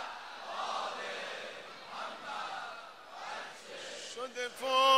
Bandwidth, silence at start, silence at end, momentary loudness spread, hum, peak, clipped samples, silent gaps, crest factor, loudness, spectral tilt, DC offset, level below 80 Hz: 16 kHz; 0 s; 0 s; 9 LU; none; -14 dBFS; under 0.1%; none; 22 dB; -39 LUFS; -0.5 dB/octave; under 0.1%; -82 dBFS